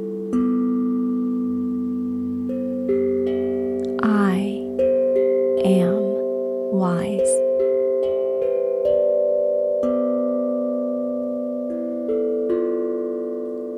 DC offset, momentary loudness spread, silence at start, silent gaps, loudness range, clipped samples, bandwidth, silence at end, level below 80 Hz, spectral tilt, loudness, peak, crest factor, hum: under 0.1%; 7 LU; 0 s; none; 3 LU; under 0.1%; 12 kHz; 0 s; -58 dBFS; -7 dB/octave; -21 LUFS; -6 dBFS; 14 dB; none